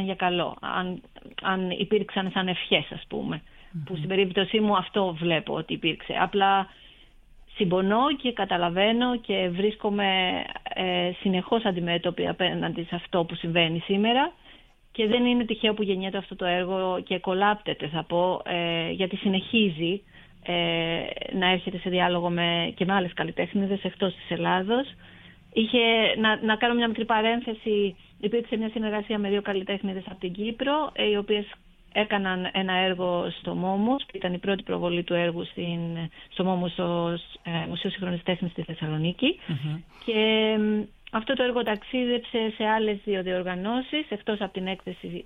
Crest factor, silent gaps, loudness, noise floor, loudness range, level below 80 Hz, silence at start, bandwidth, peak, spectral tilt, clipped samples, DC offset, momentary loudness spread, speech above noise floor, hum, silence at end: 22 dB; none; -26 LUFS; -53 dBFS; 4 LU; -56 dBFS; 0 s; 4 kHz; -4 dBFS; -8 dB/octave; under 0.1%; under 0.1%; 9 LU; 27 dB; none; 0 s